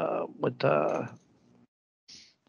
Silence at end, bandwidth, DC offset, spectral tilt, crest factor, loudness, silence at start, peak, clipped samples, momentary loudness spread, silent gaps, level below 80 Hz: 0.3 s; 7.2 kHz; under 0.1%; -7 dB/octave; 20 dB; -29 LUFS; 0 s; -12 dBFS; under 0.1%; 24 LU; 1.68-2.07 s; -76 dBFS